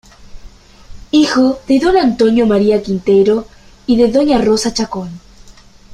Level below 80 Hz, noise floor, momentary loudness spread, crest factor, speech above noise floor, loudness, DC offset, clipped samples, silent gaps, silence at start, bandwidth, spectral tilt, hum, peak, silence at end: -38 dBFS; -40 dBFS; 8 LU; 12 dB; 28 dB; -13 LUFS; under 0.1%; under 0.1%; none; 0.2 s; 12.5 kHz; -5.5 dB/octave; none; -2 dBFS; 0 s